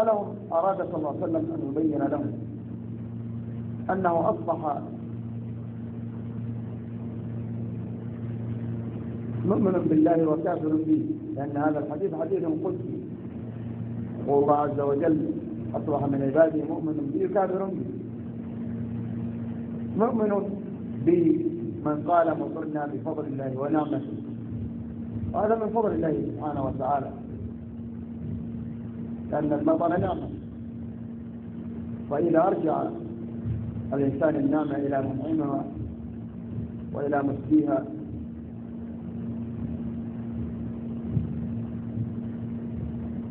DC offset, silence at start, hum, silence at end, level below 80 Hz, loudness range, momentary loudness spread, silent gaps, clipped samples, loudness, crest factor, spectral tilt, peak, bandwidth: under 0.1%; 0 s; none; 0 s; -52 dBFS; 7 LU; 13 LU; none; under 0.1%; -29 LUFS; 22 dB; -9.5 dB/octave; -6 dBFS; 3.8 kHz